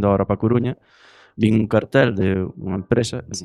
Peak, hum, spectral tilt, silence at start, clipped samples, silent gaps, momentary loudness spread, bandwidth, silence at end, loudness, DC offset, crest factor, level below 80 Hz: -2 dBFS; none; -6.5 dB/octave; 0 s; under 0.1%; none; 10 LU; 11.5 kHz; 0 s; -20 LUFS; under 0.1%; 18 dB; -46 dBFS